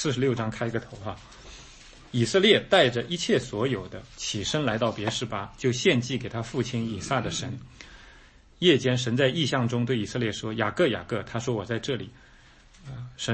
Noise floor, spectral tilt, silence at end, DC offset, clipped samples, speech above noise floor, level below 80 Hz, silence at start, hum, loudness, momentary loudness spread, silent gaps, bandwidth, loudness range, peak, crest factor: -54 dBFS; -4.5 dB/octave; 0 s; under 0.1%; under 0.1%; 27 dB; -54 dBFS; 0 s; none; -26 LUFS; 20 LU; none; 8.8 kHz; 4 LU; -6 dBFS; 22 dB